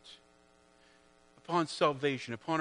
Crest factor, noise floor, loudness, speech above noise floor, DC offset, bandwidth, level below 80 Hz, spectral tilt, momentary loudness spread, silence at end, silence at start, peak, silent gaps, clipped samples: 22 dB; -65 dBFS; -33 LUFS; 33 dB; under 0.1%; 10.5 kHz; -78 dBFS; -5 dB/octave; 21 LU; 0 s; 0.05 s; -14 dBFS; none; under 0.1%